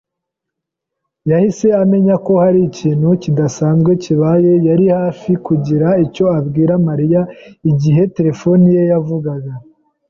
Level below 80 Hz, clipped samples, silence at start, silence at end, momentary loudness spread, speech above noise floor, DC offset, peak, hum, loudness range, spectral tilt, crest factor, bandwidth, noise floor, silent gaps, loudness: -50 dBFS; under 0.1%; 1.25 s; 0.5 s; 8 LU; 67 dB; under 0.1%; -2 dBFS; none; 2 LU; -9 dB/octave; 10 dB; 7.4 kHz; -79 dBFS; none; -13 LUFS